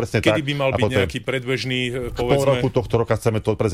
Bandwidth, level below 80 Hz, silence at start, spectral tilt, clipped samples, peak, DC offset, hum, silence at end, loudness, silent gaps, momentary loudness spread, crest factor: 15.5 kHz; -40 dBFS; 0 s; -6 dB/octave; under 0.1%; -6 dBFS; 0.2%; none; 0 s; -21 LUFS; none; 5 LU; 14 dB